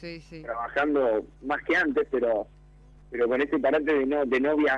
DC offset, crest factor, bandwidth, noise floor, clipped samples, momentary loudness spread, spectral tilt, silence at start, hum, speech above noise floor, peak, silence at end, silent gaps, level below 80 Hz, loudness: under 0.1%; 14 dB; 8 kHz; -52 dBFS; under 0.1%; 12 LU; -6 dB/octave; 0 s; none; 26 dB; -12 dBFS; 0 s; none; -54 dBFS; -26 LUFS